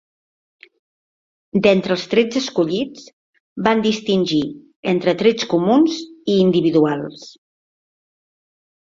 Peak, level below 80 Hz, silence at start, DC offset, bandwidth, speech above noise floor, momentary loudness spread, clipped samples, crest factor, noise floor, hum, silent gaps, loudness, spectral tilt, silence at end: 0 dBFS; -60 dBFS; 1.55 s; under 0.1%; 7.6 kHz; over 73 dB; 11 LU; under 0.1%; 18 dB; under -90 dBFS; none; 3.13-3.33 s, 3.40-3.56 s, 4.76-4.83 s; -18 LUFS; -6 dB/octave; 1.6 s